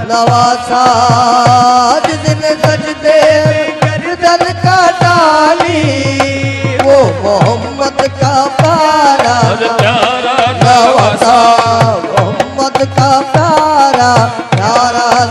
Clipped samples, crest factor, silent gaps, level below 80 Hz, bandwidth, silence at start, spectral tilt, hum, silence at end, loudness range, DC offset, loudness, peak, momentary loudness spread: 0.3%; 8 dB; none; -42 dBFS; 12.5 kHz; 0 s; -5 dB/octave; none; 0 s; 2 LU; under 0.1%; -9 LUFS; 0 dBFS; 6 LU